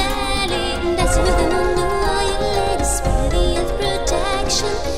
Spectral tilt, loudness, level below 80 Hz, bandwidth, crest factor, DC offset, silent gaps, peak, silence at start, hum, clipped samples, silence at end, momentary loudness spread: -4 dB/octave; -19 LUFS; -24 dBFS; 16 kHz; 14 dB; 4%; none; -4 dBFS; 0 s; none; under 0.1%; 0 s; 3 LU